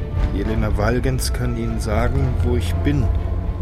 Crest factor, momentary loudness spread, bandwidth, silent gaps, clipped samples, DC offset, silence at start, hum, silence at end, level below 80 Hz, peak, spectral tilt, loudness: 14 dB; 4 LU; 14.5 kHz; none; under 0.1%; 0.7%; 0 s; none; 0 s; -22 dBFS; -4 dBFS; -6.5 dB/octave; -21 LUFS